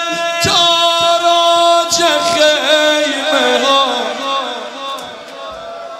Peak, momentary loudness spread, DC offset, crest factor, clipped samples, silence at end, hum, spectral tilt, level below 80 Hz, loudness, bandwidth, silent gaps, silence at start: 0 dBFS; 17 LU; under 0.1%; 14 dB; under 0.1%; 0 s; none; -1.5 dB/octave; -52 dBFS; -11 LUFS; 16 kHz; none; 0 s